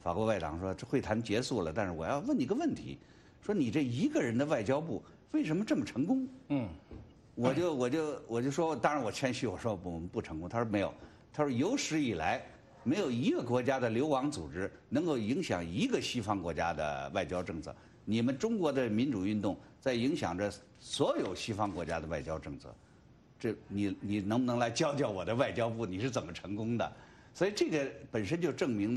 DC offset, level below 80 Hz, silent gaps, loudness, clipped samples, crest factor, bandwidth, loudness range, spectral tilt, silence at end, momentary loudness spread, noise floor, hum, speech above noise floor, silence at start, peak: under 0.1%; -60 dBFS; none; -34 LUFS; under 0.1%; 18 dB; 12.5 kHz; 2 LU; -5.5 dB/octave; 0 s; 9 LU; -61 dBFS; none; 27 dB; 0.05 s; -16 dBFS